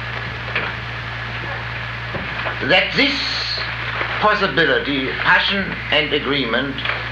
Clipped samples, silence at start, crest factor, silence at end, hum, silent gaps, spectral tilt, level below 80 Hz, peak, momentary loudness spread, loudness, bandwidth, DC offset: under 0.1%; 0 s; 18 dB; 0 s; none; none; -5 dB/octave; -38 dBFS; -2 dBFS; 11 LU; -19 LUFS; 9.4 kHz; under 0.1%